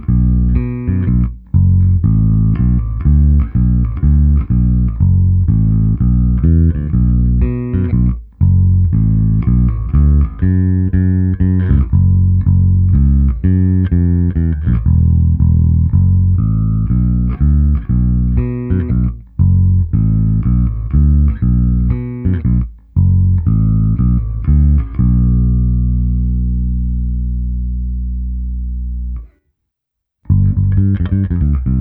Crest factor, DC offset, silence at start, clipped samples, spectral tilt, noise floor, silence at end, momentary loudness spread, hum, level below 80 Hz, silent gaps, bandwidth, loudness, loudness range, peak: 12 dB; under 0.1%; 0 s; under 0.1%; -14 dB/octave; -77 dBFS; 0 s; 6 LU; 60 Hz at -25 dBFS; -16 dBFS; none; 2.6 kHz; -14 LUFS; 5 LU; 0 dBFS